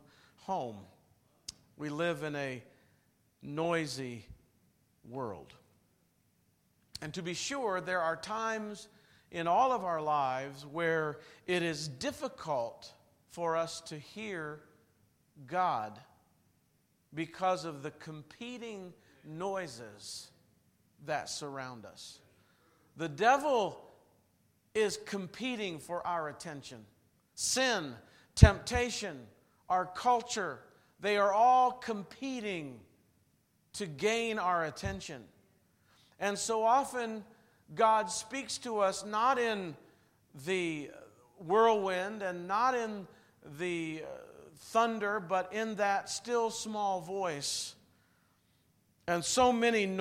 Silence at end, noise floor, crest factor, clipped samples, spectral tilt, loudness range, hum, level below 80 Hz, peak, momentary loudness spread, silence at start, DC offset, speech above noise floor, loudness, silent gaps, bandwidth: 0 s; -73 dBFS; 32 dB; under 0.1%; -4.5 dB/octave; 10 LU; none; -50 dBFS; -4 dBFS; 20 LU; 0.45 s; under 0.1%; 40 dB; -33 LUFS; none; 16 kHz